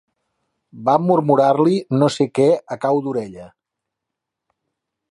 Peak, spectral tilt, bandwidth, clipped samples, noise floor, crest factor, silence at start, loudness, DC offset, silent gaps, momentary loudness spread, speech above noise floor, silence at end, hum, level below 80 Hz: -2 dBFS; -7 dB/octave; 11.5 kHz; under 0.1%; -82 dBFS; 18 dB; 0.75 s; -17 LUFS; under 0.1%; none; 10 LU; 65 dB; 1.65 s; none; -64 dBFS